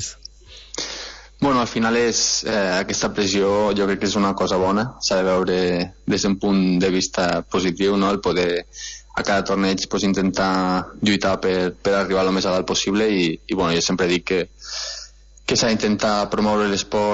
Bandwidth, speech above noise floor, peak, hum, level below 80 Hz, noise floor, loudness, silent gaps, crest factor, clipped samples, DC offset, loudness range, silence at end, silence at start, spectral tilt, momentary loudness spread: 8 kHz; 22 dB; -4 dBFS; none; -46 dBFS; -42 dBFS; -20 LUFS; none; 16 dB; under 0.1%; under 0.1%; 2 LU; 0 s; 0 s; -4 dB/octave; 9 LU